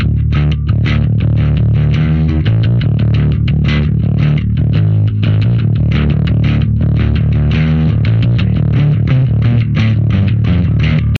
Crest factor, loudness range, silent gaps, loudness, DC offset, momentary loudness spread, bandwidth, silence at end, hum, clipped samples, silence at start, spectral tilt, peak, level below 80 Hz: 10 dB; 0 LU; none; -12 LUFS; under 0.1%; 1 LU; 4.7 kHz; 0 s; none; under 0.1%; 0 s; -9.5 dB/octave; 0 dBFS; -20 dBFS